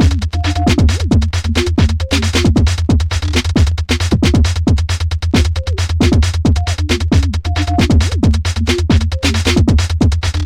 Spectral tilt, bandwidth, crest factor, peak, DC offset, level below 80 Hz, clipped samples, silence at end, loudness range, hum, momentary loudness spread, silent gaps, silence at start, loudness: -5.5 dB/octave; 12.5 kHz; 12 dB; 0 dBFS; under 0.1%; -18 dBFS; under 0.1%; 0 s; 1 LU; none; 4 LU; none; 0 s; -14 LUFS